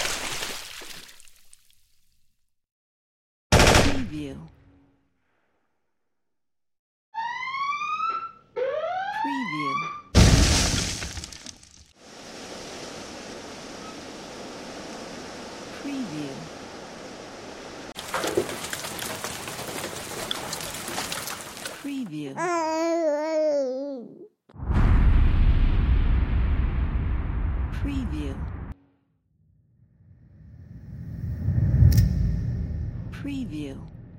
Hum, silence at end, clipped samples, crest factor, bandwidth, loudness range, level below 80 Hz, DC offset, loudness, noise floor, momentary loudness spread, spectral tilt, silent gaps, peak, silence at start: none; 0 s; under 0.1%; 22 dB; 16.5 kHz; 14 LU; -30 dBFS; under 0.1%; -26 LUFS; -89 dBFS; 19 LU; -4.5 dB/octave; 2.72-3.50 s, 6.79-7.12 s; -4 dBFS; 0 s